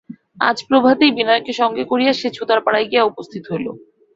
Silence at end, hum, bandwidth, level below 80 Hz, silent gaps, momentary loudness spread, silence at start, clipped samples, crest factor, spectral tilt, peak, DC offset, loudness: 0.4 s; none; 7.8 kHz; -62 dBFS; none; 12 LU; 0.1 s; under 0.1%; 16 dB; -5 dB/octave; -2 dBFS; under 0.1%; -17 LUFS